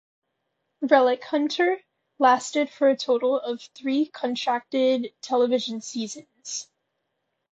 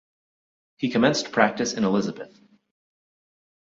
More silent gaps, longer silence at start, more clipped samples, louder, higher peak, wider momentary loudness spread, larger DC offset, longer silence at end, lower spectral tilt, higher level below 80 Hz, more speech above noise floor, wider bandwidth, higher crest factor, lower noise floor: neither; about the same, 0.8 s vs 0.8 s; neither; about the same, -24 LUFS vs -23 LUFS; about the same, -4 dBFS vs -4 dBFS; about the same, 13 LU vs 13 LU; neither; second, 0.9 s vs 1.5 s; second, -3 dB/octave vs -4.5 dB/octave; second, -78 dBFS vs -64 dBFS; second, 55 dB vs over 67 dB; about the same, 8.2 kHz vs 7.8 kHz; about the same, 20 dB vs 22 dB; second, -78 dBFS vs under -90 dBFS